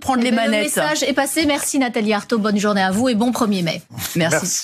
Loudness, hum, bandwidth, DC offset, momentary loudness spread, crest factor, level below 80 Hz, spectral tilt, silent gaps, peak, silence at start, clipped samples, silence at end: -18 LUFS; none; 14.5 kHz; under 0.1%; 3 LU; 14 dB; -56 dBFS; -3.5 dB/octave; none; -4 dBFS; 0 s; under 0.1%; 0 s